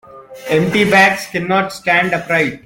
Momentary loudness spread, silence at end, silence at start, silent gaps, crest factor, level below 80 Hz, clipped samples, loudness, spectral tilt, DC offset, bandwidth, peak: 8 LU; 0.05 s; 0.1 s; none; 14 dB; -50 dBFS; under 0.1%; -14 LUFS; -5 dB/octave; under 0.1%; 17 kHz; 0 dBFS